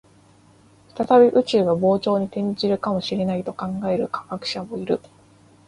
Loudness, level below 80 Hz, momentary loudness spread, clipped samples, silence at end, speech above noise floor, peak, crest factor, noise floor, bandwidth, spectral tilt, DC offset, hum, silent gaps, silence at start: -21 LUFS; -60 dBFS; 13 LU; under 0.1%; 0.7 s; 33 dB; -4 dBFS; 18 dB; -53 dBFS; 11 kHz; -7 dB/octave; under 0.1%; none; none; 0.95 s